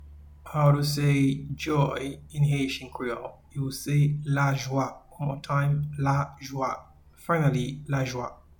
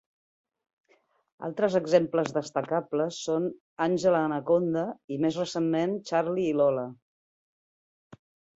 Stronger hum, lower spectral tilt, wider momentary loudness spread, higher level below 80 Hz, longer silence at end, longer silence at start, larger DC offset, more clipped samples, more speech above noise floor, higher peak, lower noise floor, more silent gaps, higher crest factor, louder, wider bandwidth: neither; about the same, -6.5 dB/octave vs -6 dB/octave; first, 11 LU vs 8 LU; first, -50 dBFS vs -70 dBFS; second, 0.25 s vs 0.4 s; second, 0 s vs 1.4 s; neither; neither; second, 20 dB vs 41 dB; about the same, -10 dBFS vs -8 dBFS; second, -46 dBFS vs -68 dBFS; second, none vs 3.60-3.76 s, 5.04-5.08 s, 7.02-8.10 s; about the same, 18 dB vs 20 dB; about the same, -27 LUFS vs -27 LUFS; first, 19 kHz vs 8 kHz